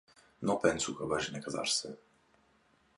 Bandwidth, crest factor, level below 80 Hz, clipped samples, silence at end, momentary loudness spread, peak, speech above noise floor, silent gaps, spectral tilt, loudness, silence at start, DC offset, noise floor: 11.5 kHz; 22 dB; -64 dBFS; under 0.1%; 1 s; 10 LU; -14 dBFS; 36 dB; none; -3 dB/octave; -33 LUFS; 0.4 s; under 0.1%; -69 dBFS